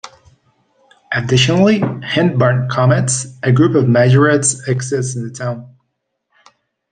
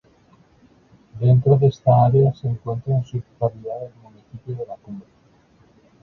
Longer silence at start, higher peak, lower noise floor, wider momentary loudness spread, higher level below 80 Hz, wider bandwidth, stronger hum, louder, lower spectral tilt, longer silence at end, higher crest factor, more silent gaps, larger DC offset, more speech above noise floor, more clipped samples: second, 0.05 s vs 1.15 s; first, 0 dBFS vs -4 dBFS; first, -71 dBFS vs -55 dBFS; second, 12 LU vs 22 LU; about the same, -50 dBFS vs -52 dBFS; first, 10 kHz vs 6 kHz; neither; first, -14 LUFS vs -20 LUFS; second, -5 dB/octave vs -10.5 dB/octave; first, 1.25 s vs 1 s; about the same, 14 dB vs 18 dB; neither; neither; first, 58 dB vs 36 dB; neither